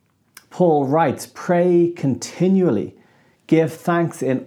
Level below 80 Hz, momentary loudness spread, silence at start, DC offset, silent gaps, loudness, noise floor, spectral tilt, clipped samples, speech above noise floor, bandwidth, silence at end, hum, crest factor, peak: -68 dBFS; 7 LU; 0.55 s; under 0.1%; none; -19 LUFS; -55 dBFS; -7 dB/octave; under 0.1%; 37 dB; 14 kHz; 0 s; none; 16 dB; -4 dBFS